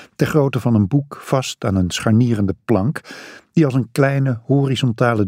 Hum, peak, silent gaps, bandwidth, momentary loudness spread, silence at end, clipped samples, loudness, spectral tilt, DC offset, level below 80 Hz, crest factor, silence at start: none; -2 dBFS; none; 15.5 kHz; 6 LU; 0 s; under 0.1%; -18 LUFS; -6.5 dB/octave; under 0.1%; -50 dBFS; 16 dB; 0 s